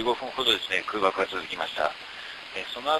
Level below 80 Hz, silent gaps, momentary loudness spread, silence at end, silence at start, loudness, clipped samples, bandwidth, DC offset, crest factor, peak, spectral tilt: -62 dBFS; none; 13 LU; 0 s; 0 s; -27 LUFS; under 0.1%; 12.5 kHz; under 0.1%; 20 dB; -8 dBFS; -2.5 dB/octave